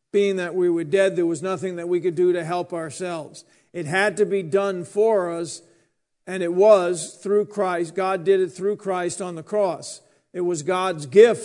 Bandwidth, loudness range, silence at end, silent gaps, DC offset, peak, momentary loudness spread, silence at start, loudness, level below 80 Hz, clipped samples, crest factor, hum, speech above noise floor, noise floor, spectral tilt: 11 kHz; 3 LU; 0 s; none; under 0.1%; -2 dBFS; 14 LU; 0.15 s; -22 LUFS; -76 dBFS; under 0.1%; 20 dB; none; 45 dB; -67 dBFS; -5 dB/octave